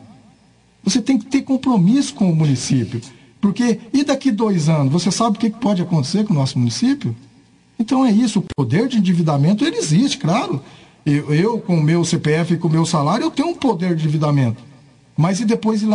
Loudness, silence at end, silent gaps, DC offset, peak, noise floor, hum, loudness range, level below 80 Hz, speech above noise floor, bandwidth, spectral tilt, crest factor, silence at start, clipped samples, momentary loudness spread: -17 LUFS; 0 s; none; under 0.1%; -6 dBFS; -53 dBFS; none; 1 LU; -56 dBFS; 36 dB; 10.5 kHz; -6 dB/octave; 12 dB; 0.85 s; under 0.1%; 5 LU